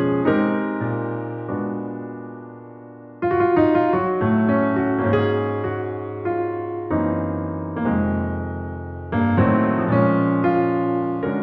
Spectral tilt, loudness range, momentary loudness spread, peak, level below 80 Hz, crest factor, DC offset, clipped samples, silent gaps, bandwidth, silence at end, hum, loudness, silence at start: -11 dB/octave; 5 LU; 14 LU; -6 dBFS; -46 dBFS; 16 dB; under 0.1%; under 0.1%; none; 5 kHz; 0 s; none; -21 LUFS; 0 s